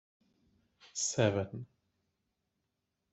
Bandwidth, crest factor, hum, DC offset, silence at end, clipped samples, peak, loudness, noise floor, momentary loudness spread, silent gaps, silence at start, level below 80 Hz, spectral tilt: 8.2 kHz; 24 dB; none; under 0.1%; 1.45 s; under 0.1%; -16 dBFS; -34 LUFS; -85 dBFS; 18 LU; none; 0.85 s; -72 dBFS; -4 dB/octave